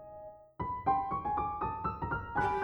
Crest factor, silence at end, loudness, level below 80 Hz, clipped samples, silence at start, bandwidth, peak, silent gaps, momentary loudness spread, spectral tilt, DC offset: 16 dB; 0 s; -35 LUFS; -52 dBFS; under 0.1%; 0 s; 8.2 kHz; -18 dBFS; none; 16 LU; -8 dB/octave; under 0.1%